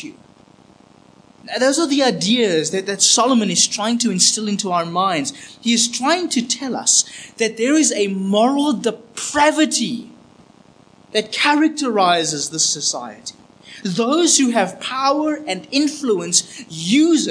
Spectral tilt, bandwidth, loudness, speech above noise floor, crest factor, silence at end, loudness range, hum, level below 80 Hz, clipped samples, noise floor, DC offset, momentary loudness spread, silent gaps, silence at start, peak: -2.5 dB/octave; 10.5 kHz; -17 LUFS; 31 dB; 18 dB; 0 s; 3 LU; none; -66 dBFS; under 0.1%; -49 dBFS; under 0.1%; 11 LU; none; 0 s; 0 dBFS